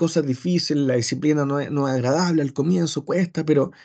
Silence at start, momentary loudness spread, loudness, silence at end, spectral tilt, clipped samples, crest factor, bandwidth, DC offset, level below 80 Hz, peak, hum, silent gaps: 0 s; 3 LU; -22 LUFS; 0.15 s; -6 dB/octave; under 0.1%; 14 dB; 9 kHz; under 0.1%; -66 dBFS; -6 dBFS; none; none